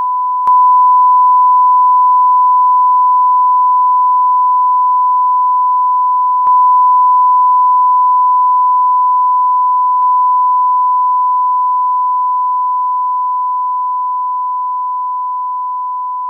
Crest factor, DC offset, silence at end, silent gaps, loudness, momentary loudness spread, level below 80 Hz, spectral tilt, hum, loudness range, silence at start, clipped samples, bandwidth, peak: 6 dB; under 0.1%; 0 s; none; -10 LUFS; 9 LU; -74 dBFS; -4 dB/octave; none; 6 LU; 0 s; under 0.1%; 1.4 kHz; -4 dBFS